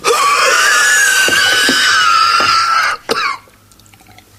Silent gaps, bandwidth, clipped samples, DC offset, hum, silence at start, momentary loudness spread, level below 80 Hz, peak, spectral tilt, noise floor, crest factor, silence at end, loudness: none; 15.5 kHz; under 0.1%; under 0.1%; none; 0 s; 8 LU; -50 dBFS; 0 dBFS; 0.5 dB/octave; -44 dBFS; 12 dB; 1 s; -9 LUFS